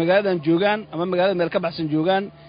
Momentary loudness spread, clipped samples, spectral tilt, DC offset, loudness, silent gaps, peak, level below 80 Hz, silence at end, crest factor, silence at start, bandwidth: 5 LU; under 0.1%; -11 dB/octave; under 0.1%; -21 LUFS; none; -4 dBFS; -60 dBFS; 0 s; 16 dB; 0 s; 5.2 kHz